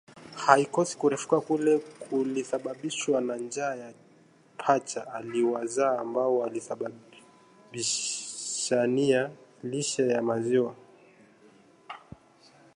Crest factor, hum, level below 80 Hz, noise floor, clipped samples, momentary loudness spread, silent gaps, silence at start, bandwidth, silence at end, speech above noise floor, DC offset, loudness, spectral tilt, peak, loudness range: 28 dB; none; -74 dBFS; -59 dBFS; under 0.1%; 13 LU; none; 0.1 s; 11.5 kHz; 0.8 s; 32 dB; under 0.1%; -28 LUFS; -4 dB/octave; -2 dBFS; 4 LU